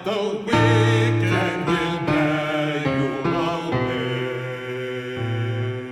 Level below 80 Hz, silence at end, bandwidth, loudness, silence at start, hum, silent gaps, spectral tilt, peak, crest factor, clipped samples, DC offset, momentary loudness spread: -50 dBFS; 0 s; 11.5 kHz; -22 LUFS; 0 s; none; none; -6.5 dB/octave; -6 dBFS; 16 dB; under 0.1%; under 0.1%; 10 LU